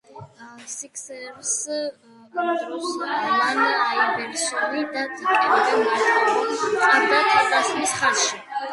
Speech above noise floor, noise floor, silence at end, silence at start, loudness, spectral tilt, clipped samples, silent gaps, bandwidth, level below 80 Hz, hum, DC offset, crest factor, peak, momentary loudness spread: 21 dB; -42 dBFS; 0 s; 0.15 s; -21 LUFS; -1 dB/octave; under 0.1%; none; 11.5 kHz; -72 dBFS; none; under 0.1%; 18 dB; -4 dBFS; 15 LU